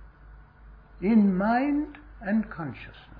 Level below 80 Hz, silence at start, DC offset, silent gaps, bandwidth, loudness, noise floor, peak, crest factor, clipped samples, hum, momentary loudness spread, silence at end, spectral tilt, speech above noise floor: -50 dBFS; 0 s; under 0.1%; none; 4.9 kHz; -26 LUFS; -50 dBFS; -12 dBFS; 16 dB; under 0.1%; none; 16 LU; 0 s; -11 dB/octave; 25 dB